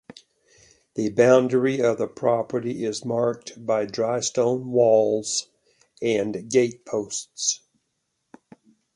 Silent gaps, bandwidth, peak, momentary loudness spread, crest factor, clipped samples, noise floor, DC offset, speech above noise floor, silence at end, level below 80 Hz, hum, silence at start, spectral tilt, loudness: none; 11.5 kHz; -6 dBFS; 10 LU; 18 dB; under 0.1%; -76 dBFS; under 0.1%; 54 dB; 1.4 s; -66 dBFS; none; 0.95 s; -4 dB/octave; -23 LUFS